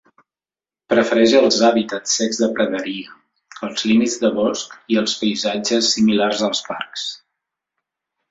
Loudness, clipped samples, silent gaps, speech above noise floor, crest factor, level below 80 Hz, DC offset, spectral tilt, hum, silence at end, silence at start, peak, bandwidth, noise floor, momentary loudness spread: -18 LUFS; under 0.1%; none; over 72 dB; 18 dB; -62 dBFS; under 0.1%; -3.5 dB/octave; none; 1.15 s; 0.9 s; -2 dBFS; 7.8 kHz; under -90 dBFS; 14 LU